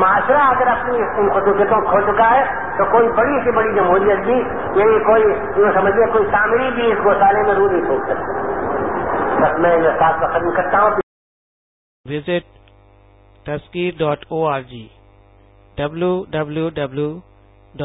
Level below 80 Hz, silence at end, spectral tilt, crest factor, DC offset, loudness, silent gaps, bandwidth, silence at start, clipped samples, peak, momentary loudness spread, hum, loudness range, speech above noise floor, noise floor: -44 dBFS; 0 s; -11 dB/octave; 14 dB; under 0.1%; -16 LUFS; 11.03-12.04 s; 4 kHz; 0 s; under 0.1%; -2 dBFS; 10 LU; none; 10 LU; 33 dB; -48 dBFS